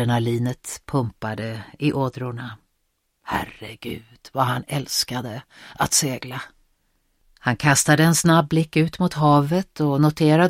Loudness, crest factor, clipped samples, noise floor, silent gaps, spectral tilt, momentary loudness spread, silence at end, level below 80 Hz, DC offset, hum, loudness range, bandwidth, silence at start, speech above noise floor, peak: -21 LUFS; 20 dB; under 0.1%; -71 dBFS; none; -4.5 dB/octave; 18 LU; 0 s; -52 dBFS; under 0.1%; none; 9 LU; 16.5 kHz; 0 s; 50 dB; -2 dBFS